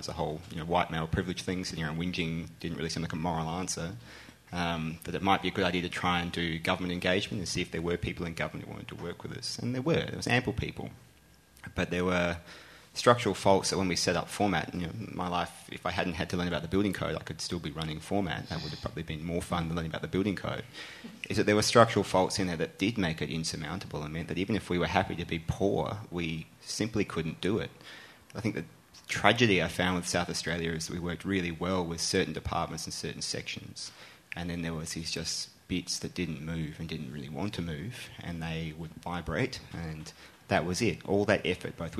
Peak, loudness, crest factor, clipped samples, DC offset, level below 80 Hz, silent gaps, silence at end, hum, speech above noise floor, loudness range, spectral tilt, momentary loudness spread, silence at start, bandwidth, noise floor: -4 dBFS; -32 LUFS; 28 dB; under 0.1%; under 0.1%; -52 dBFS; none; 0 s; none; 28 dB; 7 LU; -4.5 dB/octave; 13 LU; 0 s; 13.5 kHz; -60 dBFS